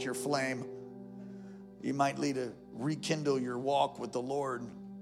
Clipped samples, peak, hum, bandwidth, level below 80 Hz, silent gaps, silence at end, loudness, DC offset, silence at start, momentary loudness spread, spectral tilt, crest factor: under 0.1%; -14 dBFS; none; 15.5 kHz; -74 dBFS; none; 0 s; -34 LUFS; under 0.1%; 0 s; 16 LU; -5 dB/octave; 20 dB